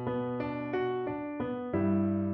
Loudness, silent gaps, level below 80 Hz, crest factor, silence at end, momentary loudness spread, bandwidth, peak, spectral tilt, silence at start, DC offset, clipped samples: -32 LUFS; none; -62 dBFS; 14 dB; 0 s; 7 LU; 5.2 kHz; -18 dBFS; -7.5 dB/octave; 0 s; under 0.1%; under 0.1%